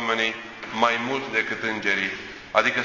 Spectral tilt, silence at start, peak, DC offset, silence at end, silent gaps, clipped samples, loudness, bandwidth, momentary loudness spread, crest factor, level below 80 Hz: -3 dB/octave; 0 s; -2 dBFS; under 0.1%; 0 s; none; under 0.1%; -24 LUFS; 7.6 kHz; 9 LU; 22 dB; -60 dBFS